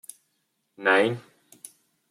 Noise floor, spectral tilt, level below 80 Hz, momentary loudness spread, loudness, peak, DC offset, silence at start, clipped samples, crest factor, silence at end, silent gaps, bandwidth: -75 dBFS; -4.5 dB/octave; -78 dBFS; 25 LU; -23 LUFS; -6 dBFS; under 0.1%; 0.8 s; under 0.1%; 22 dB; 0.9 s; none; 15.5 kHz